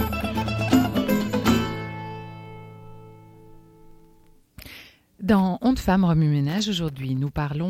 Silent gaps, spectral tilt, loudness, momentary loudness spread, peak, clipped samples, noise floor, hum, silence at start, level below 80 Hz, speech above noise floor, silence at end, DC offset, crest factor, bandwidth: none; -6.5 dB/octave; -23 LUFS; 22 LU; -6 dBFS; under 0.1%; -54 dBFS; none; 0 s; -42 dBFS; 33 dB; 0 s; under 0.1%; 18 dB; 16.5 kHz